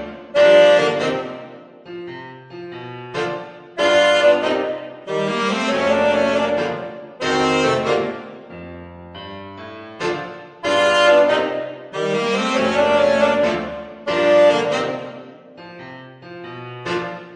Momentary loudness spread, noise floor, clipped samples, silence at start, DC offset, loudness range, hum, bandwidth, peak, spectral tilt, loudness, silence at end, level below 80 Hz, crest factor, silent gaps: 23 LU; -39 dBFS; under 0.1%; 0 s; under 0.1%; 5 LU; none; 10 kHz; -2 dBFS; -4 dB/octave; -17 LUFS; 0 s; -56 dBFS; 18 dB; none